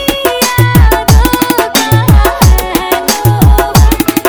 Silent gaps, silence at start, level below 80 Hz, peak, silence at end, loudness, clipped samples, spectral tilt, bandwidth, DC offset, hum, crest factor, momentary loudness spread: none; 0 s; -12 dBFS; 0 dBFS; 0 s; -8 LUFS; 1%; -5 dB/octave; 20 kHz; under 0.1%; none; 8 dB; 4 LU